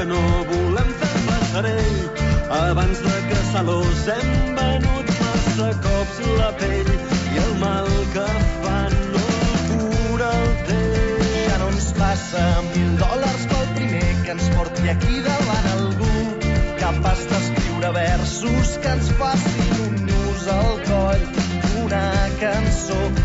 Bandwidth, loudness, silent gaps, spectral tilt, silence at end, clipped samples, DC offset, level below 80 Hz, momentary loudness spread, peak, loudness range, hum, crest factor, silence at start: 8 kHz; -20 LUFS; none; -5.5 dB/octave; 0 s; under 0.1%; under 0.1%; -24 dBFS; 2 LU; -8 dBFS; 1 LU; none; 12 dB; 0 s